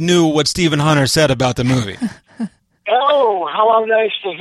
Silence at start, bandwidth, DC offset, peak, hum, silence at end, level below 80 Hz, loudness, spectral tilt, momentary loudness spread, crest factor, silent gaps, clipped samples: 0 s; 14 kHz; under 0.1%; -2 dBFS; none; 0 s; -44 dBFS; -15 LUFS; -5 dB/octave; 15 LU; 14 dB; none; under 0.1%